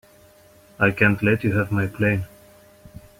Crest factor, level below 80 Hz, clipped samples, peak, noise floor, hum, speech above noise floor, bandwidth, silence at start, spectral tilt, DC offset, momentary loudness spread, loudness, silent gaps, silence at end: 20 dB; -50 dBFS; under 0.1%; -2 dBFS; -52 dBFS; none; 32 dB; 16 kHz; 0.8 s; -8 dB/octave; under 0.1%; 7 LU; -21 LUFS; none; 0.2 s